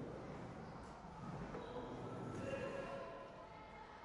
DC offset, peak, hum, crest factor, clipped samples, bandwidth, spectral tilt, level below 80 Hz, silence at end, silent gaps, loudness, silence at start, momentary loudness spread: under 0.1%; -34 dBFS; none; 16 dB; under 0.1%; 11.5 kHz; -6.5 dB/octave; -66 dBFS; 0 s; none; -50 LUFS; 0 s; 9 LU